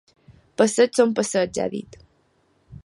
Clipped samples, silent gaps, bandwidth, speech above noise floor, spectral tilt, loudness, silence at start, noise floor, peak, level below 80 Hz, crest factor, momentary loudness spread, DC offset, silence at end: under 0.1%; none; 11.5 kHz; 43 dB; -4 dB/octave; -21 LUFS; 0.3 s; -64 dBFS; -4 dBFS; -58 dBFS; 20 dB; 14 LU; under 0.1%; 0.05 s